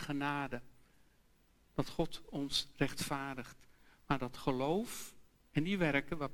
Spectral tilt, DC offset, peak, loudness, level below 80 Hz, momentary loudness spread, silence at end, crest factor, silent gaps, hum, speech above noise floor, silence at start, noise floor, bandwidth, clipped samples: -5 dB/octave; under 0.1%; -16 dBFS; -38 LUFS; -56 dBFS; 12 LU; 0 s; 22 dB; none; none; 32 dB; 0 s; -69 dBFS; 17.5 kHz; under 0.1%